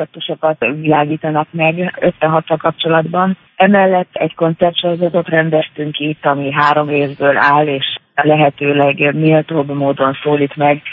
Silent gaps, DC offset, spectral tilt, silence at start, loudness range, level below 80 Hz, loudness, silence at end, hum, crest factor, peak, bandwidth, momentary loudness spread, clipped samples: none; under 0.1%; -8.5 dB/octave; 0 s; 2 LU; -58 dBFS; -14 LUFS; 0 s; none; 14 dB; 0 dBFS; 5.6 kHz; 6 LU; under 0.1%